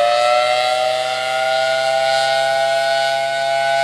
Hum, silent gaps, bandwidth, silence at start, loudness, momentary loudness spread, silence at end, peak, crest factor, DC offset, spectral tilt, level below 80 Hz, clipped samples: none; none; 15 kHz; 0 s; -16 LUFS; 4 LU; 0 s; -6 dBFS; 12 dB; under 0.1%; -1 dB/octave; -62 dBFS; under 0.1%